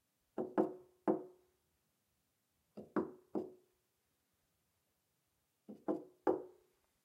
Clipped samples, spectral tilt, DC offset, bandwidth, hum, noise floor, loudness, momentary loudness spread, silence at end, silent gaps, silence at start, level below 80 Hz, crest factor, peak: under 0.1%; -8.5 dB/octave; under 0.1%; 13 kHz; none; -83 dBFS; -42 LUFS; 20 LU; 0.55 s; none; 0.35 s; -88 dBFS; 26 dB; -20 dBFS